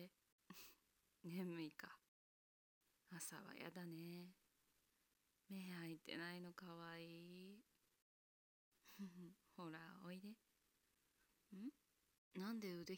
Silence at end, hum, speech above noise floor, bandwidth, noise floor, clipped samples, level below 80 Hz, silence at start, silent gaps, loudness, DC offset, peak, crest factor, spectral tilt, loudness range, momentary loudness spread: 0 s; none; 31 dB; 17 kHz; -86 dBFS; under 0.1%; under -90 dBFS; 0 s; 0.32-0.39 s, 2.08-2.81 s, 8.02-8.72 s, 12.18-12.31 s; -56 LUFS; under 0.1%; -38 dBFS; 20 dB; -5 dB/octave; 5 LU; 13 LU